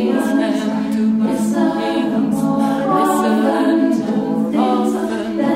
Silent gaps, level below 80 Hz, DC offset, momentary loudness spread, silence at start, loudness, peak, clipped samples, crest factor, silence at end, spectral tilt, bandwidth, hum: none; -54 dBFS; under 0.1%; 4 LU; 0 s; -17 LUFS; -4 dBFS; under 0.1%; 12 dB; 0 s; -6 dB/octave; 15.5 kHz; none